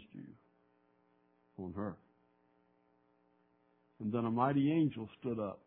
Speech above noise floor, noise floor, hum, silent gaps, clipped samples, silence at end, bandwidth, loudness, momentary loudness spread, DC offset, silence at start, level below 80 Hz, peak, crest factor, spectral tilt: 38 dB; -73 dBFS; none; none; under 0.1%; 0.1 s; 4 kHz; -36 LUFS; 20 LU; under 0.1%; 0 s; -76 dBFS; -18 dBFS; 20 dB; -7.5 dB/octave